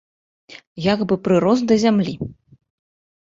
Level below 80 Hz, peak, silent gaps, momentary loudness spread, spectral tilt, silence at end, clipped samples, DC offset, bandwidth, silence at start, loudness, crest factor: -54 dBFS; -4 dBFS; 0.67-0.76 s; 16 LU; -6.5 dB/octave; 0.9 s; under 0.1%; under 0.1%; 7.8 kHz; 0.5 s; -18 LUFS; 18 dB